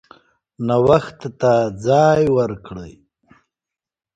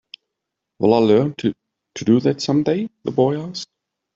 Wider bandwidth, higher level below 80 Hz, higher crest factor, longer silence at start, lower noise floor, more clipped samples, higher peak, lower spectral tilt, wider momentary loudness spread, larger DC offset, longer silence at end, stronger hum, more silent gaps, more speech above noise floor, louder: first, 9 kHz vs 7.8 kHz; first, -48 dBFS vs -60 dBFS; about the same, 18 dB vs 18 dB; second, 0.6 s vs 0.8 s; first, -88 dBFS vs -81 dBFS; neither; about the same, 0 dBFS vs -2 dBFS; about the same, -7 dB/octave vs -6.5 dB/octave; first, 18 LU vs 15 LU; neither; first, 1.25 s vs 0.5 s; neither; neither; first, 71 dB vs 63 dB; about the same, -17 LUFS vs -19 LUFS